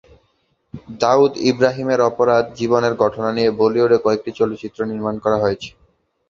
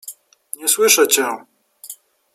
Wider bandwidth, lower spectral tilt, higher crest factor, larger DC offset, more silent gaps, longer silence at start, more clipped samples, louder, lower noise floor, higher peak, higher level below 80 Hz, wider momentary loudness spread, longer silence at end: second, 7.4 kHz vs 16 kHz; first, -6 dB/octave vs 0.5 dB/octave; about the same, 18 dB vs 20 dB; neither; neither; first, 0.75 s vs 0.05 s; neither; second, -18 LUFS vs -15 LUFS; first, -64 dBFS vs -40 dBFS; about the same, 0 dBFS vs 0 dBFS; first, -54 dBFS vs -74 dBFS; second, 9 LU vs 24 LU; first, 0.6 s vs 0.4 s